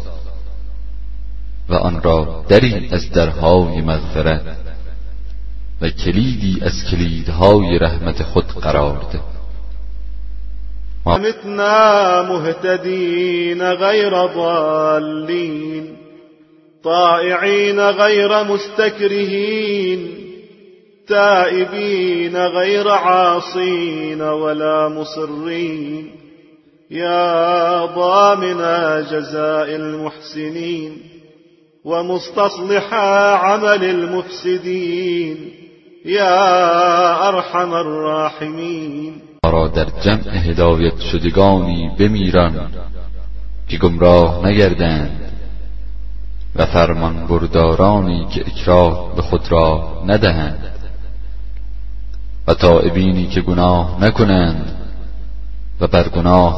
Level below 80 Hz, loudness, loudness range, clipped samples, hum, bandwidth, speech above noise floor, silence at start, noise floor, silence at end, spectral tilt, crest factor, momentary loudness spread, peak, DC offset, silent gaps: -28 dBFS; -15 LUFS; 5 LU; under 0.1%; none; 6.2 kHz; 36 dB; 0 s; -50 dBFS; 0 s; -6.5 dB/octave; 16 dB; 20 LU; 0 dBFS; under 0.1%; none